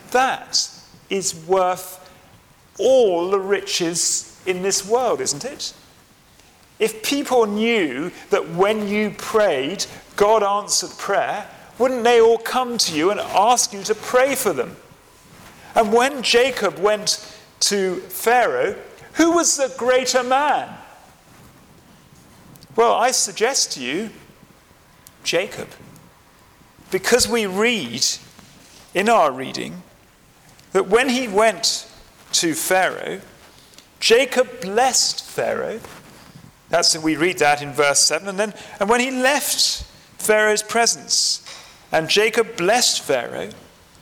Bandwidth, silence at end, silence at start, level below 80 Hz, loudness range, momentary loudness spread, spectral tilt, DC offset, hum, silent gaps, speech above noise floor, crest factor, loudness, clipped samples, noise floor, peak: 19.5 kHz; 0.45 s; 0.05 s; -54 dBFS; 4 LU; 11 LU; -2 dB/octave; under 0.1%; none; none; 33 dB; 20 dB; -19 LUFS; under 0.1%; -52 dBFS; -2 dBFS